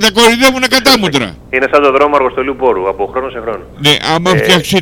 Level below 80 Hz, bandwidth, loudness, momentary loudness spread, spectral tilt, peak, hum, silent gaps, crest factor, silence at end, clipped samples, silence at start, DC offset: -38 dBFS; 20 kHz; -10 LUFS; 10 LU; -3.5 dB/octave; 0 dBFS; 60 Hz at -40 dBFS; none; 10 dB; 0 s; 0.8%; 0 s; under 0.1%